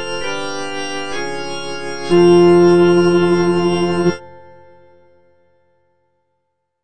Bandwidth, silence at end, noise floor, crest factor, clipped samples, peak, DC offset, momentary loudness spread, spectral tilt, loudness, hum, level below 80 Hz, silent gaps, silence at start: 8.8 kHz; 0 s; -72 dBFS; 16 dB; under 0.1%; 0 dBFS; under 0.1%; 15 LU; -6.5 dB/octave; -15 LUFS; none; -52 dBFS; none; 0 s